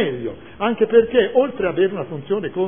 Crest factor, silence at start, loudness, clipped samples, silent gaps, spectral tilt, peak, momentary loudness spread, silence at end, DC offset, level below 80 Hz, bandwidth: 18 dB; 0 s; -19 LUFS; under 0.1%; none; -10.5 dB/octave; -2 dBFS; 13 LU; 0 s; 0.6%; -52 dBFS; 3.6 kHz